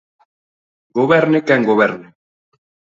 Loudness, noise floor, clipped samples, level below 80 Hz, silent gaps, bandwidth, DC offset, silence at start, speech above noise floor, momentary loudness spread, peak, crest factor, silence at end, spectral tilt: -15 LUFS; under -90 dBFS; under 0.1%; -60 dBFS; none; 7.6 kHz; under 0.1%; 0.95 s; over 76 dB; 10 LU; 0 dBFS; 18 dB; 0.95 s; -7 dB/octave